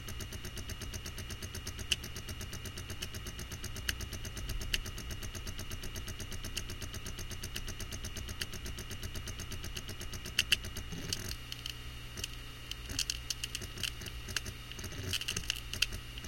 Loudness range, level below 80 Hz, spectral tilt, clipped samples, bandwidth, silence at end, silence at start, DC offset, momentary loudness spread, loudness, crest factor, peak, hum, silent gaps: 5 LU; -46 dBFS; -2 dB/octave; under 0.1%; 17 kHz; 0 s; 0 s; under 0.1%; 8 LU; -39 LUFS; 30 dB; -10 dBFS; 60 Hz at -50 dBFS; none